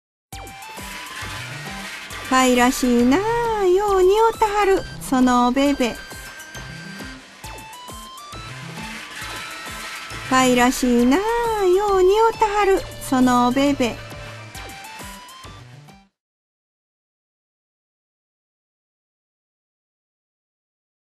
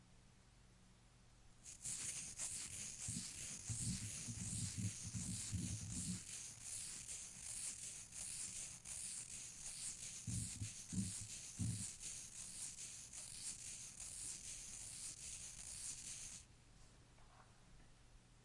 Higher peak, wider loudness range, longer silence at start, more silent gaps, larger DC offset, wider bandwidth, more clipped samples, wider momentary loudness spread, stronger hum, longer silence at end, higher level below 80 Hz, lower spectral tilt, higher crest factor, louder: first, -4 dBFS vs -30 dBFS; first, 16 LU vs 4 LU; first, 0.3 s vs 0 s; neither; neither; first, 13.5 kHz vs 11.5 kHz; neither; first, 19 LU vs 13 LU; neither; first, 5.3 s vs 0 s; first, -42 dBFS vs -66 dBFS; first, -4 dB/octave vs -2.5 dB/octave; about the same, 18 dB vs 20 dB; first, -19 LUFS vs -47 LUFS